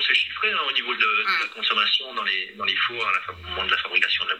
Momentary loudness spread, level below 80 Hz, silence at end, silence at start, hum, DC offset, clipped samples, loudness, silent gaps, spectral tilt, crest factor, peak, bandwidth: 5 LU; -56 dBFS; 0 s; 0 s; none; under 0.1%; under 0.1%; -22 LUFS; none; -1.5 dB/octave; 20 dB; -4 dBFS; 15.5 kHz